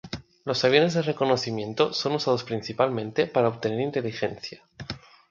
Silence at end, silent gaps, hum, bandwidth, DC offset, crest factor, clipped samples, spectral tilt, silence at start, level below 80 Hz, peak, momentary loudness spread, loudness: 0.3 s; none; none; 7.6 kHz; under 0.1%; 22 dB; under 0.1%; -5.5 dB/octave; 0.05 s; -60 dBFS; -4 dBFS; 17 LU; -25 LUFS